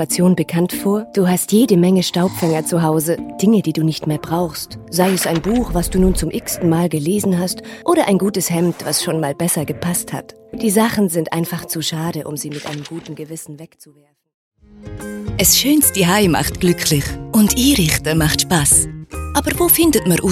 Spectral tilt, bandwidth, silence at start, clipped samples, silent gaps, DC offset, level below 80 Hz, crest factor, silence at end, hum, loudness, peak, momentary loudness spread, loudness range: -4.5 dB/octave; 16.5 kHz; 0 s; under 0.1%; 14.34-14.51 s; under 0.1%; -34 dBFS; 16 dB; 0 s; none; -16 LUFS; 0 dBFS; 14 LU; 7 LU